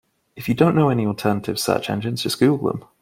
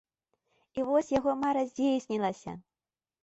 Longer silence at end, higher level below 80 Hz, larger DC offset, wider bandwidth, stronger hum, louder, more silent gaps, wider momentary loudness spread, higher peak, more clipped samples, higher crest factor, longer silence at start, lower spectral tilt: second, 0.2 s vs 0.65 s; first, -56 dBFS vs -66 dBFS; neither; first, 16.5 kHz vs 8.2 kHz; neither; first, -20 LUFS vs -30 LUFS; neither; second, 8 LU vs 15 LU; first, -2 dBFS vs -16 dBFS; neither; about the same, 18 dB vs 16 dB; second, 0.35 s vs 0.75 s; about the same, -6 dB/octave vs -6 dB/octave